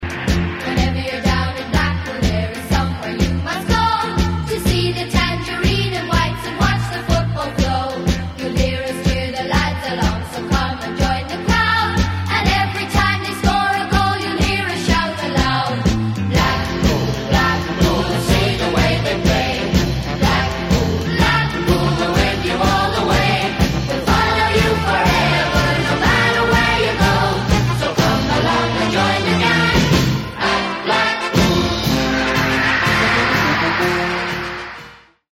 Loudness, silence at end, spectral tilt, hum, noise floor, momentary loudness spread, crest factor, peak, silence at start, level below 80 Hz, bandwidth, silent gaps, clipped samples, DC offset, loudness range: -17 LUFS; 0.4 s; -5 dB/octave; none; -41 dBFS; 6 LU; 16 dB; 0 dBFS; 0 s; -26 dBFS; 16.5 kHz; none; under 0.1%; under 0.1%; 4 LU